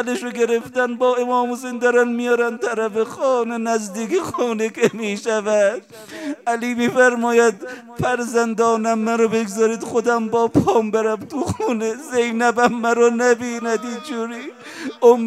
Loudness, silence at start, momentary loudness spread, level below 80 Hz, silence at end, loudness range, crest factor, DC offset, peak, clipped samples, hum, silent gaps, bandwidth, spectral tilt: -19 LUFS; 0 s; 10 LU; -60 dBFS; 0 s; 2 LU; 18 dB; under 0.1%; 0 dBFS; under 0.1%; none; none; 14 kHz; -4.5 dB/octave